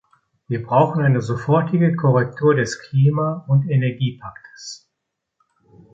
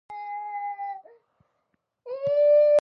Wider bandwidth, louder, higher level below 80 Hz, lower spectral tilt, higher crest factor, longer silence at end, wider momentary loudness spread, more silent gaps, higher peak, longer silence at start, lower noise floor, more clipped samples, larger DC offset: first, 7.8 kHz vs 6 kHz; first, -19 LUFS vs -24 LUFS; first, -56 dBFS vs -72 dBFS; first, -7.5 dB/octave vs -5 dB/octave; first, 18 dB vs 12 dB; first, 1.15 s vs 0.05 s; about the same, 18 LU vs 19 LU; neither; first, -2 dBFS vs -12 dBFS; first, 0.5 s vs 0.1 s; about the same, -79 dBFS vs -76 dBFS; neither; neither